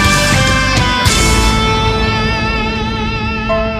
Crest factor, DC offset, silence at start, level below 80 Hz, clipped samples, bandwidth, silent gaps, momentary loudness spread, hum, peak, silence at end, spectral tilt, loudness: 12 dB; under 0.1%; 0 s; -20 dBFS; under 0.1%; 15.5 kHz; none; 7 LU; none; 0 dBFS; 0 s; -4 dB/octave; -12 LUFS